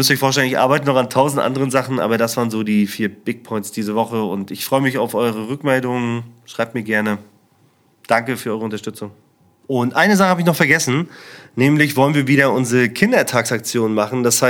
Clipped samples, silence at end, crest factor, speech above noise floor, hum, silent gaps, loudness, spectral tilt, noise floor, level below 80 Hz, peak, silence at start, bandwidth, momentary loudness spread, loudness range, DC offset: under 0.1%; 0 s; 18 dB; 39 dB; none; none; -17 LUFS; -4.5 dB/octave; -56 dBFS; -64 dBFS; 0 dBFS; 0 s; 19 kHz; 11 LU; 7 LU; under 0.1%